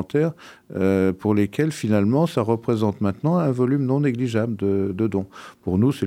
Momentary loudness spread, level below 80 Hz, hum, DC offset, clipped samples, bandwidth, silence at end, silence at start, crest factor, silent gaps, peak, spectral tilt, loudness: 5 LU; -58 dBFS; none; under 0.1%; under 0.1%; 15.5 kHz; 0 s; 0 s; 16 dB; none; -6 dBFS; -8 dB/octave; -22 LUFS